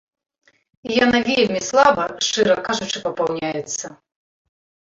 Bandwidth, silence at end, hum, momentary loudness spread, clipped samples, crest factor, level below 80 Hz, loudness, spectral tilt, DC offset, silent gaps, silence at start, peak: 7.8 kHz; 1 s; none; 12 LU; under 0.1%; 20 dB; -56 dBFS; -19 LUFS; -3 dB/octave; under 0.1%; none; 0.85 s; -2 dBFS